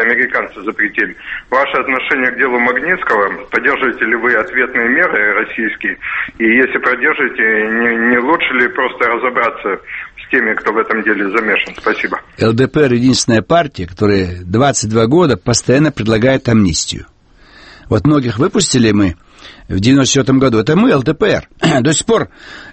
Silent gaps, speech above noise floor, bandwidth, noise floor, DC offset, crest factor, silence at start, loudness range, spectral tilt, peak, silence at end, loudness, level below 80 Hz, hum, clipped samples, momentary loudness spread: none; 30 dB; 8.8 kHz; -43 dBFS; under 0.1%; 14 dB; 0 s; 2 LU; -4.5 dB/octave; 0 dBFS; 0 s; -13 LUFS; -40 dBFS; none; under 0.1%; 7 LU